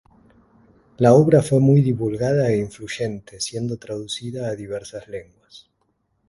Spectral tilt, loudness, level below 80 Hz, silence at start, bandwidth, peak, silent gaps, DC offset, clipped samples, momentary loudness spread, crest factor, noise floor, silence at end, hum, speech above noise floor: -7 dB/octave; -20 LUFS; -54 dBFS; 1 s; 11.5 kHz; 0 dBFS; none; under 0.1%; under 0.1%; 17 LU; 20 dB; -69 dBFS; 0.7 s; none; 49 dB